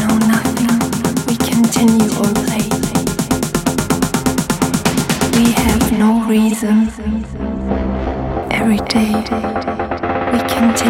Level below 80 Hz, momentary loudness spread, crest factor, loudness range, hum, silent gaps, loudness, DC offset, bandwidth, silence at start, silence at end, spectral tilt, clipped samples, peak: -32 dBFS; 8 LU; 14 dB; 3 LU; none; none; -15 LUFS; under 0.1%; 16.5 kHz; 0 s; 0 s; -5 dB/octave; under 0.1%; 0 dBFS